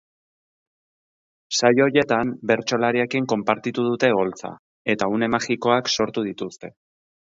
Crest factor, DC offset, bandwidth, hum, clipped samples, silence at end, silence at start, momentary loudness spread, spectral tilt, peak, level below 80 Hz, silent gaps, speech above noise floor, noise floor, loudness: 20 dB; under 0.1%; 7.8 kHz; none; under 0.1%; 0.6 s; 1.5 s; 13 LU; -4.5 dB/octave; -4 dBFS; -62 dBFS; 4.59-4.85 s; over 69 dB; under -90 dBFS; -21 LUFS